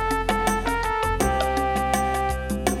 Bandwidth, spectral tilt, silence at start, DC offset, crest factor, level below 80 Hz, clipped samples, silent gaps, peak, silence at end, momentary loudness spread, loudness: 17.5 kHz; -4.5 dB/octave; 0 s; under 0.1%; 18 dB; -32 dBFS; under 0.1%; none; -6 dBFS; 0 s; 3 LU; -23 LUFS